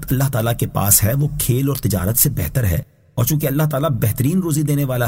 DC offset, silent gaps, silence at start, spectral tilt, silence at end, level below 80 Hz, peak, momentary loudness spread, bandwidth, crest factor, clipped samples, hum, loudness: under 0.1%; none; 0 s; -5 dB/octave; 0 s; -36 dBFS; 0 dBFS; 7 LU; 16.5 kHz; 18 dB; under 0.1%; none; -17 LUFS